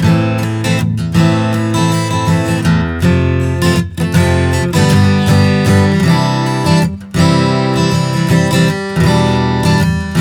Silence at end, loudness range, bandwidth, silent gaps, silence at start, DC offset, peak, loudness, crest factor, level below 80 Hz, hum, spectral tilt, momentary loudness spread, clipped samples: 0 s; 2 LU; 16.5 kHz; none; 0 s; under 0.1%; 0 dBFS; -12 LUFS; 12 dB; -32 dBFS; none; -6 dB/octave; 4 LU; under 0.1%